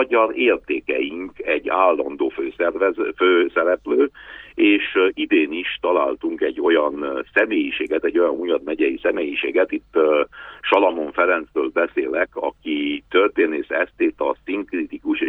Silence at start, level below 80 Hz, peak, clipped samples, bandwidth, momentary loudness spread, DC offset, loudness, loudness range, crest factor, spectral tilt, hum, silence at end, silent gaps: 0 s; -56 dBFS; -2 dBFS; under 0.1%; 4.3 kHz; 7 LU; under 0.1%; -20 LUFS; 2 LU; 18 dB; -6 dB/octave; none; 0 s; none